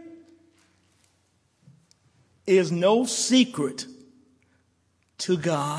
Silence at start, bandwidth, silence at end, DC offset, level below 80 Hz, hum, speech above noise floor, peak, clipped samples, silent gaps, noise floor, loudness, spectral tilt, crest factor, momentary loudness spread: 0 s; 11 kHz; 0 s; under 0.1%; -74 dBFS; none; 46 dB; -6 dBFS; under 0.1%; none; -68 dBFS; -23 LUFS; -4.5 dB/octave; 20 dB; 16 LU